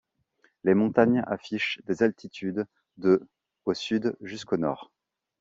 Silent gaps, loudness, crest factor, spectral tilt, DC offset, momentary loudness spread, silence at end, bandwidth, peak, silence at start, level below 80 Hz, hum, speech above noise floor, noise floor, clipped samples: none; -27 LUFS; 22 dB; -6.5 dB/octave; under 0.1%; 12 LU; 0.55 s; 7.8 kHz; -6 dBFS; 0.65 s; -68 dBFS; none; 42 dB; -68 dBFS; under 0.1%